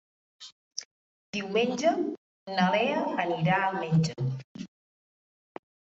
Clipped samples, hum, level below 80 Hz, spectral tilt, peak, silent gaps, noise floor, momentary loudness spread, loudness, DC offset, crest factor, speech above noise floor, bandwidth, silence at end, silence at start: under 0.1%; none; -70 dBFS; -5.5 dB/octave; -12 dBFS; 0.52-0.71 s, 0.85-1.33 s, 2.18-2.46 s, 4.44-4.55 s; under -90 dBFS; 23 LU; -28 LUFS; under 0.1%; 18 dB; over 63 dB; 8 kHz; 1.3 s; 0.4 s